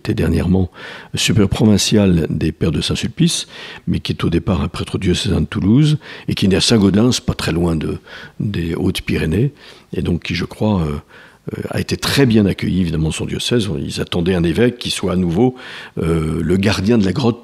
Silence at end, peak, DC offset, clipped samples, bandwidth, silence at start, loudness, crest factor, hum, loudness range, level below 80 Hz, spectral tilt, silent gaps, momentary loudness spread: 0.05 s; 0 dBFS; under 0.1%; under 0.1%; 15 kHz; 0.05 s; -17 LUFS; 16 dB; none; 5 LU; -38 dBFS; -5.5 dB/octave; none; 11 LU